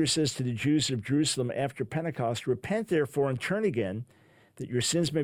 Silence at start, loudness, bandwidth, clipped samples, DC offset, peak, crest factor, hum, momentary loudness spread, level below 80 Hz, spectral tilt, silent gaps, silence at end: 0 s; -29 LUFS; 16 kHz; under 0.1%; under 0.1%; -16 dBFS; 14 dB; none; 7 LU; -62 dBFS; -4.5 dB/octave; none; 0 s